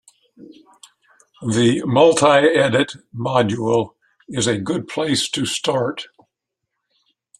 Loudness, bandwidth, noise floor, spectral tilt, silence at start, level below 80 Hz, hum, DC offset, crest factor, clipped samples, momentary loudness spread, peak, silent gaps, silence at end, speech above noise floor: -18 LUFS; 13 kHz; -79 dBFS; -4.5 dB/octave; 0.4 s; -58 dBFS; none; under 0.1%; 18 dB; under 0.1%; 15 LU; 0 dBFS; none; 1.35 s; 61 dB